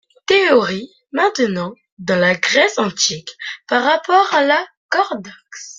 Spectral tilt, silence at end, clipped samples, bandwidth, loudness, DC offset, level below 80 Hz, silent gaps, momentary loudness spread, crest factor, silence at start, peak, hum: -3 dB/octave; 0.05 s; under 0.1%; 9.4 kHz; -16 LUFS; under 0.1%; -62 dBFS; 1.92-1.97 s, 4.77-4.89 s; 15 LU; 16 dB; 0.3 s; 0 dBFS; none